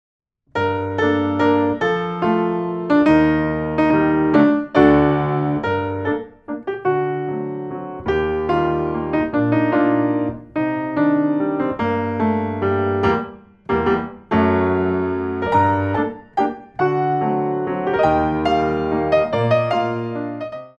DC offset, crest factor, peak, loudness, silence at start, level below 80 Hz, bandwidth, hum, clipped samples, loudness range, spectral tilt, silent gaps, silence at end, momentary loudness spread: under 0.1%; 18 dB; -2 dBFS; -19 LUFS; 0.55 s; -44 dBFS; 6.8 kHz; none; under 0.1%; 4 LU; -8.5 dB/octave; none; 0.1 s; 9 LU